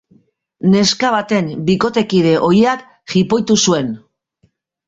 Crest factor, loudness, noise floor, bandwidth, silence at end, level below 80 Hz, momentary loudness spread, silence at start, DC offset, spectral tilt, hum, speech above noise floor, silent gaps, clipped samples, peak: 14 dB; -15 LUFS; -60 dBFS; 8 kHz; 0.9 s; -52 dBFS; 7 LU; 0.65 s; under 0.1%; -5 dB/octave; none; 46 dB; none; under 0.1%; -2 dBFS